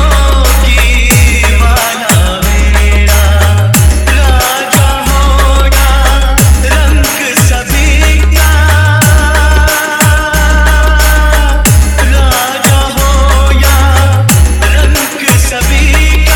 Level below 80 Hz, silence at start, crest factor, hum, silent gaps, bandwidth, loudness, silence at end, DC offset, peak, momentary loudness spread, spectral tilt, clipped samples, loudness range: -8 dBFS; 0 s; 6 dB; none; none; over 20 kHz; -8 LUFS; 0 s; under 0.1%; 0 dBFS; 2 LU; -4 dB/octave; 1%; 1 LU